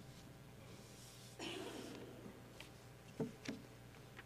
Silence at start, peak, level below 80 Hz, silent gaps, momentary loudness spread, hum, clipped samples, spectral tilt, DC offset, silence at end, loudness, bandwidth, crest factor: 0 s; -30 dBFS; -70 dBFS; none; 11 LU; none; under 0.1%; -4.5 dB/octave; under 0.1%; 0 s; -52 LUFS; 15.5 kHz; 24 dB